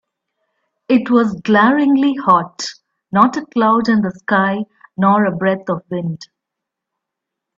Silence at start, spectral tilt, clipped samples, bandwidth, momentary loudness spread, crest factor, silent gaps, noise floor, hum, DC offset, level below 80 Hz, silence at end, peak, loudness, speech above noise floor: 0.9 s; -6.5 dB/octave; under 0.1%; 7.8 kHz; 12 LU; 16 dB; none; -81 dBFS; none; under 0.1%; -60 dBFS; 1.35 s; 0 dBFS; -15 LUFS; 66 dB